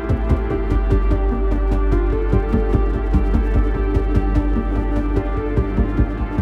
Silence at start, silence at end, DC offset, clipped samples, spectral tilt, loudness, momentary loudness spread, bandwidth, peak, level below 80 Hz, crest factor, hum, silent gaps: 0 s; 0 s; under 0.1%; under 0.1%; -9.5 dB/octave; -20 LUFS; 3 LU; 4.4 kHz; -4 dBFS; -18 dBFS; 14 dB; none; none